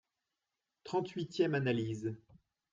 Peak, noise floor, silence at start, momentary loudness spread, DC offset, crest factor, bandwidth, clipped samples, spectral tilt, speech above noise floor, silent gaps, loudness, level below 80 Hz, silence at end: -18 dBFS; -89 dBFS; 0.85 s; 14 LU; under 0.1%; 20 dB; 7.6 kHz; under 0.1%; -7 dB/octave; 54 dB; none; -36 LUFS; -74 dBFS; 0.55 s